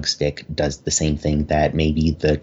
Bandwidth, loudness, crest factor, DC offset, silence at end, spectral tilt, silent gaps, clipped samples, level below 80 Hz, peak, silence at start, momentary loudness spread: 8.2 kHz; -20 LUFS; 14 dB; under 0.1%; 0 s; -5 dB/octave; none; under 0.1%; -30 dBFS; -6 dBFS; 0 s; 5 LU